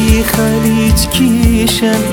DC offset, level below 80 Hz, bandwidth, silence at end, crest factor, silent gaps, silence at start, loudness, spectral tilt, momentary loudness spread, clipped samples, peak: under 0.1%; -18 dBFS; 18 kHz; 0 s; 10 dB; none; 0 s; -11 LUFS; -5 dB/octave; 2 LU; under 0.1%; 0 dBFS